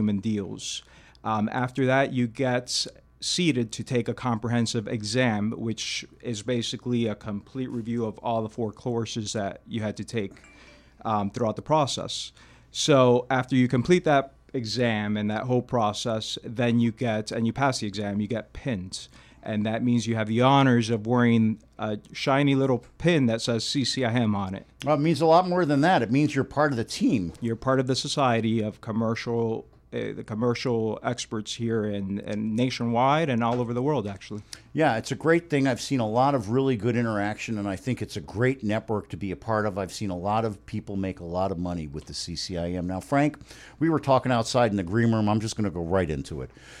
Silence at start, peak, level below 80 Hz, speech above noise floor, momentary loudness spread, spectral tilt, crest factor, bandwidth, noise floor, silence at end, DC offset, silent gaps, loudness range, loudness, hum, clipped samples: 0 s; -6 dBFS; -56 dBFS; 27 dB; 11 LU; -5.5 dB/octave; 18 dB; 13.5 kHz; -52 dBFS; 0 s; under 0.1%; none; 6 LU; -26 LUFS; none; under 0.1%